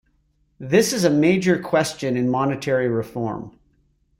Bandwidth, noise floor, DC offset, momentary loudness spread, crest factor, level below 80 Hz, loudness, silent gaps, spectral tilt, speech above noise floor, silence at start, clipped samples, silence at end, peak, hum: 16.5 kHz; -64 dBFS; under 0.1%; 11 LU; 18 dB; -56 dBFS; -20 LUFS; none; -5.5 dB/octave; 44 dB; 0.6 s; under 0.1%; 0.7 s; -4 dBFS; none